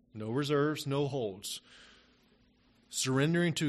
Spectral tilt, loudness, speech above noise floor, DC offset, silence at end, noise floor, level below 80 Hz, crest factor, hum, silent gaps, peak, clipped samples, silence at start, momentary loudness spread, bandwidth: -5 dB/octave; -33 LUFS; 35 dB; under 0.1%; 0 s; -67 dBFS; -68 dBFS; 16 dB; none; none; -18 dBFS; under 0.1%; 0.15 s; 11 LU; 13 kHz